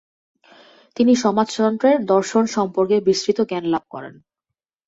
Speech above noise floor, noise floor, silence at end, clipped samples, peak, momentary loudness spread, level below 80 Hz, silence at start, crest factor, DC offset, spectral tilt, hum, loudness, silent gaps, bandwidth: 65 dB; -84 dBFS; 0.75 s; under 0.1%; -4 dBFS; 15 LU; -62 dBFS; 1 s; 16 dB; under 0.1%; -5 dB/octave; none; -19 LUFS; none; 8 kHz